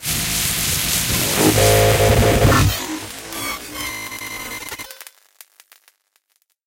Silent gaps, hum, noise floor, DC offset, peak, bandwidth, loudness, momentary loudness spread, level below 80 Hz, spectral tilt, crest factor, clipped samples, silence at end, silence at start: none; none; -66 dBFS; under 0.1%; -2 dBFS; 17 kHz; -17 LUFS; 15 LU; -30 dBFS; -3.5 dB/octave; 18 dB; under 0.1%; 1.65 s; 0 s